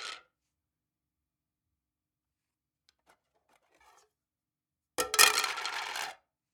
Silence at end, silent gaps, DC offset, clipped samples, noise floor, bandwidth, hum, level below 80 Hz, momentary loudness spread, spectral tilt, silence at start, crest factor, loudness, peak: 0.4 s; none; under 0.1%; under 0.1%; under -90 dBFS; 19 kHz; none; -76 dBFS; 21 LU; 2 dB/octave; 0 s; 32 dB; -27 LUFS; -4 dBFS